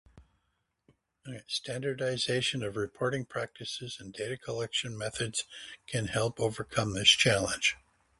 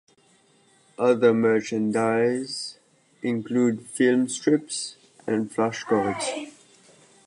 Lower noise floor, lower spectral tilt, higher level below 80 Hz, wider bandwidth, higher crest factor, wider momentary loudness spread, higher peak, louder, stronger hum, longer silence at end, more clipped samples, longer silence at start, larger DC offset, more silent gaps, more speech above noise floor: first, -79 dBFS vs -60 dBFS; second, -3 dB/octave vs -5 dB/octave; first, -60 dBFS vs -70 dBFS; about the same, 11.5 kHz vs 11 kHz; first, 26 dB vs 18 dB; about the same, 15 LU vs 13 LU; about the same, -8 dBFS vs -6 dBFS; second, -30 LUFS vs -24 LUFS; neither; second, 0.45 s vs 0.75 s; neither; second, 0.15 s vs 1 s; neither; neither; first, 47 dB vs 37 dB